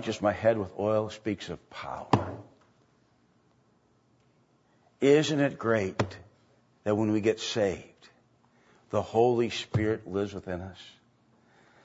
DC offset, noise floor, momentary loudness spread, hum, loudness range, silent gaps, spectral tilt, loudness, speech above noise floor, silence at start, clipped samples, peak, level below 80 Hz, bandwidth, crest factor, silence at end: under 0.1%; -67 dBFS; 16 LU; none; 8 LU; none; -6 dB/octave; -29 LUFS; 39 dB; 0 s; under 0.1%; -6 dBFS; -62 dBFS; 8 kHz; 24 dB; 0.95 s